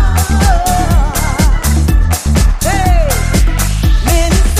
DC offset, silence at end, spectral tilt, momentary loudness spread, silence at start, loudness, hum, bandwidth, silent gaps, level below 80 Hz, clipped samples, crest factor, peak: under 0.1%; 0 s; -5 dB/octave; 2 LU; 0 s; -12 LUFS; none; 15.5 kHz; none; -12 dBFS; under 0.1%; 10 dB; 0 dBFS